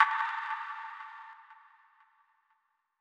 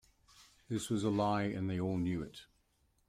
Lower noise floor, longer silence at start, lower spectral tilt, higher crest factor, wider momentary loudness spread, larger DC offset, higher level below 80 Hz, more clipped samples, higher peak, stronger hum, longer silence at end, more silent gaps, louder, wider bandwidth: about the same, -76 dBFS vs -75 dBFS; second, 0 s vs 0.4 s; second, 6 dB/octave vs -6.5 dB/octave; first, 28 dB vs 18 dB; first, 24 LU vs 10 LU; neither; second, under -90 dBFS vs -64 dBFS; neither; first, -8 dBFS vs -20 dBFS; neither; first, 1.4 s vs 0.65 s; neither; about the same, -35 LUFS vs -36 LUFS; second, 8.8 kHz vs 15.5 kHz